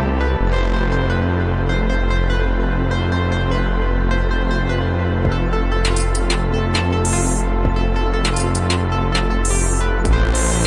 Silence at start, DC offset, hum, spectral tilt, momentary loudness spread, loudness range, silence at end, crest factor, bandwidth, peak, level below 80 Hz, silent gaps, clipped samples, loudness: 0 s; under 0.1%; none; -5 dB/octave; 2 LU; 1 LU; 0 s; 14 dB; 11.5 kHz; -2 dBFS; -20 dBFS; none; under 0.1%; -19 LUFS